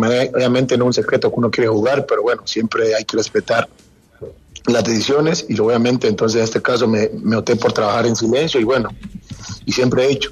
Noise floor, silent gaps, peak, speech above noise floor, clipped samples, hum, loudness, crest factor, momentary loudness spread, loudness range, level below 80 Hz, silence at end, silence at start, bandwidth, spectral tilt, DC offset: -37 dBFS; none; -2 dBFS; 21 dB; under 0.1%; none; -16 LUFS; 14 dB; 12 LU; 2 LU; -48 dBFS; 0 s; 0 s; 13 kHz; -5 dB/octave; under 0.1%